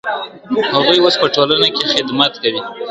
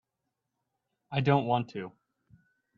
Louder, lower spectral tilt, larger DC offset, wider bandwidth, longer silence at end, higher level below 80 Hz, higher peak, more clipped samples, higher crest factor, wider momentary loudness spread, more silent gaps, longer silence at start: first, -13 LUFS vs -29 LUFS; second, -4 dB/octave vs -8.5 dB/octave; neither; first, 10.5 kHz vs 6.6 kHz; second, 0 s vs 0.9 s; first, -54 dBFS vs -66 dBFS; first, 0 dBFS vs -10 dBFS; neither; second, 16 dB vs 24 dB; second, 11 LU vs 15 LU; neither; second, 0.05 s vs 1.1 s